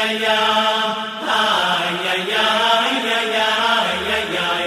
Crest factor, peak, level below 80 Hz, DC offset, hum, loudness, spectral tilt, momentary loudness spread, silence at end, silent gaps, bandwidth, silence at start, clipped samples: 16 dB; -2 dBFS; -54 dBFS; under 0.1%; none; -17 LUFS; -2.5 dB/octave; 4 LU; 0 s; none; 16 kHz; 0 s; under 0.1%